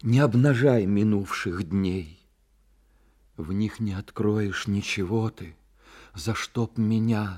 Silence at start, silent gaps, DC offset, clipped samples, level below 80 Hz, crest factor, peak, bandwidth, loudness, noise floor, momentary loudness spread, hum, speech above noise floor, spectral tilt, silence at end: 0.05 s; none; under 0.1%; under 0.1%; -54 dBFS; 18 dB; -8 dBFS; 14 kHz; -25 LUFS; -62 dBFS; 14 LU; none; 38 dB; -7 dB/octave; 0 s